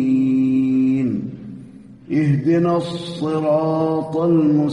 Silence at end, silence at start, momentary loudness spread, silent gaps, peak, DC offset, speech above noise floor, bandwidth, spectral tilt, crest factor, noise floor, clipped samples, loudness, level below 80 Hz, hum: 0 s; 0 s; 10 LU; none; -6 dBFS; under 0.1%; 23 dB; 10.5 kHz; -8.5 dB/octave; 12 dB; -40 dBFS; under 0.1%; -18 LUFS; -56 dBFS; none